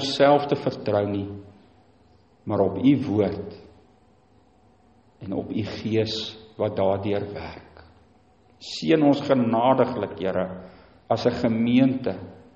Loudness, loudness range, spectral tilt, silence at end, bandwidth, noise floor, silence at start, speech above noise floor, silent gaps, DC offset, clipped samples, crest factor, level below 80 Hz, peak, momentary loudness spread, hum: -23 LUFS; 6 LU; -7 dB/octave; 0.2 s; 8.4 kHz; -58 dBFS; 0 s; 36 dB; none; under 0.1%; under 0.1%; 18 dB; -58 dBFS; -6 dBFS; 17 LU; none